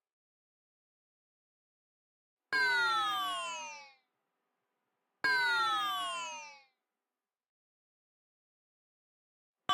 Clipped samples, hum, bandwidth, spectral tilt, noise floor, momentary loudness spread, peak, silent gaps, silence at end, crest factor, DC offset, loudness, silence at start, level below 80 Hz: under 0.1%; none; 16.5 kHz; 0 dB/octave; under -90 dBFS; 17 LU; -20 dBFS; 7.49-9.54 s; 0 s; 18 dB; under 0.1%; -32 LUFS; 2.5 s; -90 dBFS